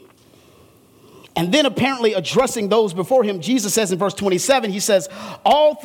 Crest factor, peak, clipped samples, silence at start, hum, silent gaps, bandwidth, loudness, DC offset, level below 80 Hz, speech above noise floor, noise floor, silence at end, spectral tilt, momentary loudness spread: 16 dB; -2 dBFS; under 0.1%; 1.35 s; none; none; 18 kHz; -18 LUFS; under 0.1%; -56 dBFS; 32 dB; -50 dBFS; 0 s; -3.5 dB/octave; 4 LU